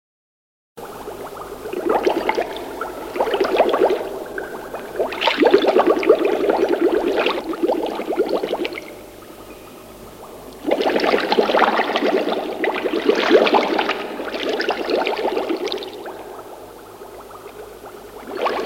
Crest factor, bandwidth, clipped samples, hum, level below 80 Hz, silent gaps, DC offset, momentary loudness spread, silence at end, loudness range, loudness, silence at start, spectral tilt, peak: 20 dB; 16.5 kHz; under 0.1%; 50 Hz at -55 dBFS; -54 dBFS; none; under 0.1%; 22 LU; 0 s; 8 LU; -19 LUFS; 0.75 s; -4 dB/octave; 0 dBFS